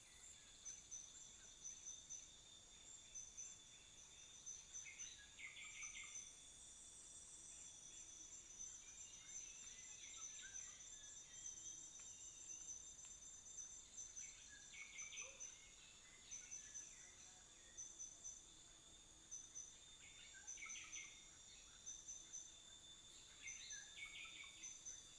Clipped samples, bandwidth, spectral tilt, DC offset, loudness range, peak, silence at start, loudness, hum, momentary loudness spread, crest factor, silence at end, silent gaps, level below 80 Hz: under 0.1%; 11 kHz; 1 dB/octave; under 0.1%; 2 LU; -42 dBFS; 0 s; -55 LUFS; none; 8 LU; 16 dB; 0 s; none; -78 dBFS